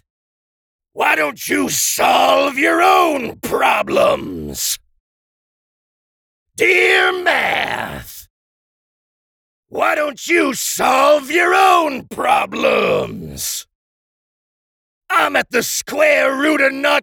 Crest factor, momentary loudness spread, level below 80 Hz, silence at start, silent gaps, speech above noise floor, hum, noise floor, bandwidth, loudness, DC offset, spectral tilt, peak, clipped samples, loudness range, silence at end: 16 dB; 11 LU; -52 dBFS; 0.95 s; 5.00-6.46 s, 8.30-9.63 s, 13.75-15.01 s; over 75 dB; none; under -90 dBFS; over 20 kHz; -15 LUFS; under 0.1%; -2 dB/octave; -2 dBFS; under 0.1%; 6 LU; 0 s